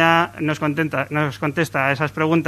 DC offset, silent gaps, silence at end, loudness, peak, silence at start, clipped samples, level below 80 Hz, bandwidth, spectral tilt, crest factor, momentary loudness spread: under 0.1%; none; 0 s; -20 LUFS; 0 dBFS; 0 s; under 0.1%; -56 dBFS; 14 kHz; -6 dB/octave; 18 dB; 4 LU